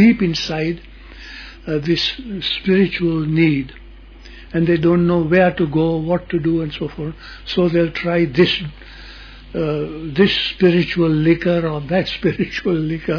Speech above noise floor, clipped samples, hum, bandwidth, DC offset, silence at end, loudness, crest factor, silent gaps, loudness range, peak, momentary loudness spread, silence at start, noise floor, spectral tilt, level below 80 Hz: 22 dB; under 0.1%; none; 5.4 kHz; under 0.1%; 0 s; -18 LUFS; 16 dB; none; 3 LU; -2 dBFS; 17 LU; 0 s; -39 dBFS; -7 dB/octave; -40 dBFS